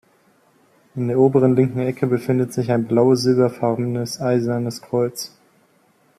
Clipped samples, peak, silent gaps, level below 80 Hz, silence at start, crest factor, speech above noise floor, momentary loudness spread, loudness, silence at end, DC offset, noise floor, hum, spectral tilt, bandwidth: under 0.1%; -4 dBFS; none; -62 dBFS; 0.95 s; 16 dB; 40 dB; 9 LU; -19 LUFS; 0.9 s; under 0.1%; -59 dBFS; none; -7 dB/octave; 14 kHz